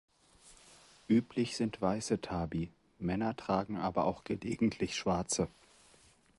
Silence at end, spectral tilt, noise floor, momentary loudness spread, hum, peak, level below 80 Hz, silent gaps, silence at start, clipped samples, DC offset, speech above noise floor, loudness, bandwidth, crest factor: 0.9 s; -5.5 dB/octave; -65 dBFS; 8 LU; none; -16 dBFS; -58 dBFS; none; 0.45 s; under 0.1%; under 0.1%; 31 dB; -35 LUFS; 11.5 kHz; 20 dB